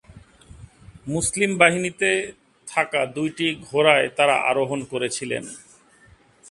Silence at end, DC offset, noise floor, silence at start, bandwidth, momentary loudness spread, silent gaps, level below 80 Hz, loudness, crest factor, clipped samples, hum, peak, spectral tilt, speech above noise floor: 0.9 s; under 0.1%; -54 dBFS; 0.1 s; 11.5 kHz; 14 LU; none; -54 dBFS; -21 LUFS; 24 dB; under 0.1%; none; 0 dBFS; -3.5 dB/octave; 33 dB